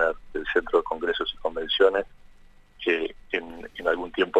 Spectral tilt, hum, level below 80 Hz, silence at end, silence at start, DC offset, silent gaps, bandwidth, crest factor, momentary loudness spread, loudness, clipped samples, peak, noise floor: -4.5 dB/octave; none; -50 dBFS; 0 s; 0 s; under 0.1%; none; 8.8 kHz; 20 dB; 10 LU; -26 LUFS; under 0.1%; -6 dBFS; -51 dBFS